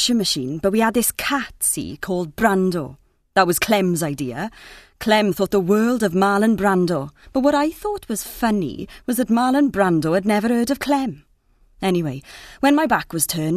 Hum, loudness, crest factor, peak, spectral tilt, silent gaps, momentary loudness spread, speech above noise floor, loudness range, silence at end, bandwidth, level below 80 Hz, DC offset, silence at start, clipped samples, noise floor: none; -20 LUFS; 18 dB; 0 dBFS; -4.5 dB/octave; none; 10 LU; 37 dB; 2 LU; 0 s; 14 kHz; -48 dBFS; under 0.1%; 0 s; under 0.1%; -57 dBFS